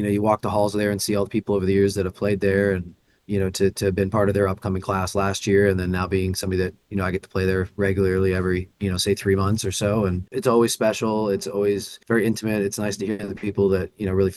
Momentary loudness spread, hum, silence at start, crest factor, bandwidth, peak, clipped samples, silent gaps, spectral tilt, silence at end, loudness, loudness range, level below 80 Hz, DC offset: 6 LU; none; 0 s; 18 dB; 12.5 kHz; -4 dBFS; under 0.1%; none; -5.5 dB/octave; 0 s; -22 LUFS; 1 LU; -50 dBFS; under 0.1%